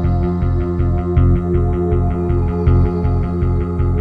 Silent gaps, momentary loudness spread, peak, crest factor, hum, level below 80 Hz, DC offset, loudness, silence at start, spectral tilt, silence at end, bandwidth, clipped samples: none; 4 LU; -2 dBFS; 14 dB; none; -20 dBFS; under 0.1%; -17 LUFS; 0 s; -11 dB/octave; 0 s; 4.4 kHz; under 0.1%